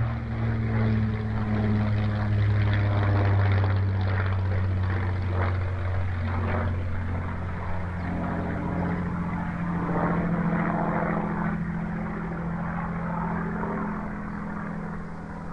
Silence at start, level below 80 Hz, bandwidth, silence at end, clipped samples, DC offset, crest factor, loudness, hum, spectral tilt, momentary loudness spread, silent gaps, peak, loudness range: 0 s; -40 dBFS; 5.4 kHz; 0 s; under 0.1%; under 0.1%; 12 dB; -27 LUFS; none; -9.5 dB/octave; 8 LU; none; -14 dBFS; 5 LU